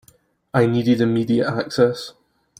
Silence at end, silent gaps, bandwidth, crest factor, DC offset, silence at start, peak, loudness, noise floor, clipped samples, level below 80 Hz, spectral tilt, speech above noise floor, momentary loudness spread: 0.5 s; none; 15.5 kHz; 18 dB; under 0.1%; 0.55 s; -4 dBFS; -19 LUFS; -57 dBFS; under 0.1%; -58 dBFS; -7 dB/octave; 38 dB; 8 LU